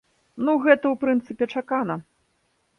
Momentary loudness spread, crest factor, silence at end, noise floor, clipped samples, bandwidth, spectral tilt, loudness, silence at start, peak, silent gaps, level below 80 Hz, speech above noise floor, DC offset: 10 LU; 22 dB; 0.8 s; -69 dBFS; under 0.1%; 6.4 kHz; -7.5 dB/octave; -23 LUFS; 0.35 s; -2 dBFS; none; -68 dBFS; 47 dB; under 0.1%